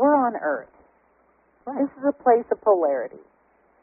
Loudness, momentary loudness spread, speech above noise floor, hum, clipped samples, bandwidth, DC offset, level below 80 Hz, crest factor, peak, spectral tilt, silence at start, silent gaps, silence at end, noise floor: -23 LUFS; 13 LU; 40 dB; none; under 0.1%; 2.6 kHz; under 0.1%; -70 dBFS; 18 dB; -6 dBFS; 1 dB/octave; 0 s; none; 0.65 s; -62 dBFS